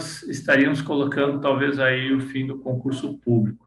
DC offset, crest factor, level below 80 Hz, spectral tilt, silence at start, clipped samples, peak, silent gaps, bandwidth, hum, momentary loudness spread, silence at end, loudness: under 0.1%; 14 dB; -62 dBFS; -6 dB/octave; 0 s; under 0.1%; -8 dBFS; none; 12 kHz; none; 10 LU; 0.1 s; -22 LUFS